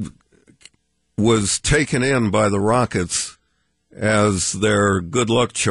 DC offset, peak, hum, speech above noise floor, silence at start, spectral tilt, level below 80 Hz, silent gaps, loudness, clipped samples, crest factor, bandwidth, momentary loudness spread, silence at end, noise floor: under 0.1%; -4 dBFS; none; 50 dB; 0 s; -4.5 dB/octave; -40 dBFS; none; -18 LUFS; under 0.1%; 16 dB; 11.5 kHz; 6 LU; 0 s; -68 dBFS